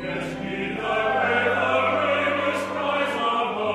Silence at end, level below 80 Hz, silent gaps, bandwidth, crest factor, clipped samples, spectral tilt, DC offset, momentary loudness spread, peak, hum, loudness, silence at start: 0 s; -56 dBFS; none; 14.5 kHz; 16 dB; under 0.1%; -5 dB/octave; under 0.1%; 8 LU; -8 dBFS; none; -23 LUFS; 0 s